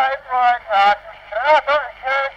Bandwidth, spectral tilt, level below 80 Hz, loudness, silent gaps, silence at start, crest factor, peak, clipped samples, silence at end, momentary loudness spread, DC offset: 8.2 kHz; -2 dB/octave; -54 dBFS; -17 LUFS; none; 0 s; 12 dB; -4 dBFS; under 0.1%; 0 s; 7 LU; under 0.1%